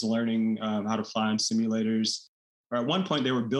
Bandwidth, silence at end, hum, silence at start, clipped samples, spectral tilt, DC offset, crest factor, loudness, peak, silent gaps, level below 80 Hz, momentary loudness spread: 11 kHz; 0 s; none; 0 s; under 0.1%; -4.5 dB/octave; under 0.1%; 14 dB; -28 LUFS; -14 dBFS; 2.28-2.64 s; -76 dBFS; 4 LU